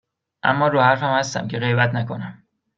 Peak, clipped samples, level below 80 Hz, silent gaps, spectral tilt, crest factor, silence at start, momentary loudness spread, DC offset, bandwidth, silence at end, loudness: -2 dBFS; under 0.1%; -62 dBFS; none; -5.5 dB/octave; 20 dB; 0.45 s; 12 LU; under 0.1%; 7.6 kHz; 0.45 s; -20 LUFS